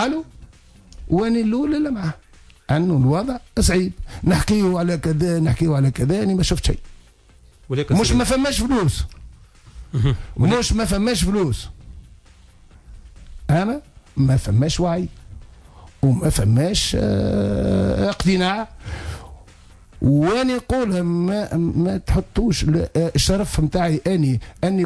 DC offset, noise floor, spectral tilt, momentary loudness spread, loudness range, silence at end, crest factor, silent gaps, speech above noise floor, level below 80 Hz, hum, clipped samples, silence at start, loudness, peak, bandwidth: under 0.1%; -50 dBFS; -6 dB/octave; 10 LU; 3 LU; 0 s; 14 dB; none; 31 dB; -32 dBFS; none; under 0.1%; 0 s; -20 LUFS; -6 dBFS; 11 kHz